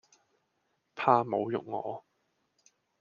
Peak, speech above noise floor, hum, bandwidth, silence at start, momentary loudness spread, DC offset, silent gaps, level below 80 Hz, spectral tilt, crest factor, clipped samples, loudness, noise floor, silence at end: -8 dBFS; 49 dB; none; 7.2 kHz; 0.95 s; 18 LU; under 0.1%; none; -80 dBFS; -7 dB/octave; 24 dB; under 0.1%; -30 LUFS; -78 dBFS; 1 s